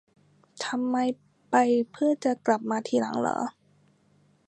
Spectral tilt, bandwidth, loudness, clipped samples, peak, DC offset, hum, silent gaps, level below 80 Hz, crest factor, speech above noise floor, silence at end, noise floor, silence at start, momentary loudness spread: -4.5 dB/octave; 9.4 kHz; -27 LUFS; under 0.1%; -8 dBFS; under 0.1%; none; none; -76 dBFS; 20 dB; 38 dB; 1 s; -64 dBFS; 0.6 s; 9 LU